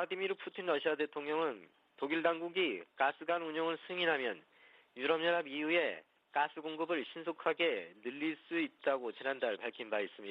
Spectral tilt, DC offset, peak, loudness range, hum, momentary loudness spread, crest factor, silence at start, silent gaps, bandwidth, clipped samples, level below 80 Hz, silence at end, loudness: -6 dB/octave; under 0.1%; -18 dBFS; 2 LU; none; 8 LU; 20 dB; 0 s; none; 5.4 kHz; under 0.1%; -88 dBFS; 0 s; -36 LUFS